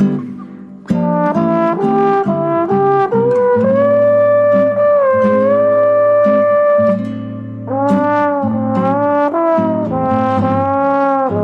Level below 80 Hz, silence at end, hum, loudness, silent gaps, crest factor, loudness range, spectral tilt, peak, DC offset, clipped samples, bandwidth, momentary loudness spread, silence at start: -54 dBFS; 0 s; none; -13 LUFS; none; 10 dB; 3 LU; -9.5 dB/octave; -4 dBFS; under 0.1%; under 0.1%; 5.6 kHz; 8 LU; 0 s